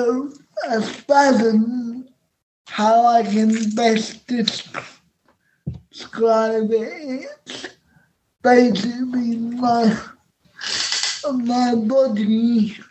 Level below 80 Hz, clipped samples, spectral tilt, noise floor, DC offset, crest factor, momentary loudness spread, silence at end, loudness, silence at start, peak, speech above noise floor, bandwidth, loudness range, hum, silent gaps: -58 dBFS; under 0.1%; -4.5 dB/octave; -63 dBFS; under 0.1%; 18 dB; 19 LU; 0.05 s; -19 LUFS; 0 s; -2 dBFS; 44 dB; 8.6 kHz; 5 LU; none; 2.43-2.65 s